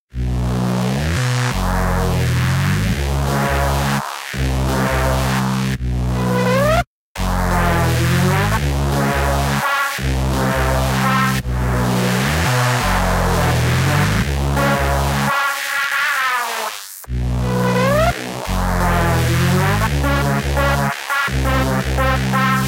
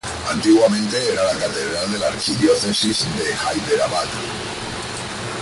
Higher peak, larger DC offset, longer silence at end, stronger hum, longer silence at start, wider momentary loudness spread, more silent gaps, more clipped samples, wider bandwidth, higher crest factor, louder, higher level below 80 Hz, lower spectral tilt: about the same, -2 dBFS vs -4 dBFS; neither; about the same, 0 s vs 0 s; neither; about the same, 0.15 s vs 0.05 s; second, 5 LU vs 11 LU; first, 6.87-7.15 s vs none; neither; first, 17 kHz vs 11.5 kHz; about the same, 14 dB vs 16 dB; about the same, -17 LUFS vs -19 LUFS; first, -24 dBFS vs -46 dBFS; first, -5 dB/octave vs -3.5 dB/octave